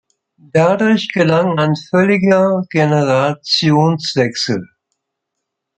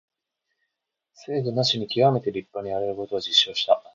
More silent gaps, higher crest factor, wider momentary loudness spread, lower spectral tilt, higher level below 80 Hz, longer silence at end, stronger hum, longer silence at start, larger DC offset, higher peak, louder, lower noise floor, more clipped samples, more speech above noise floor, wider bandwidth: neither; second, 14 dB vs 22 dB; second, 5 LU vs 11 LU; first, -6 dB/octave vs -4.5 dB/octave; first, -58 dBFS vs -64 dBFS; first, 1.15 s vs 0.15 s; neither; second, 0.55 s vs 1.2 s; neither; first, 0 dBFS vs -4 dBFS; first, -14 LUFS vs -23 LUFS; second, -77 dBFS vs -82 dBFS; neither; first, 63 dB vs 58 dB; first, 8.8 kHz vs 7.6 kHz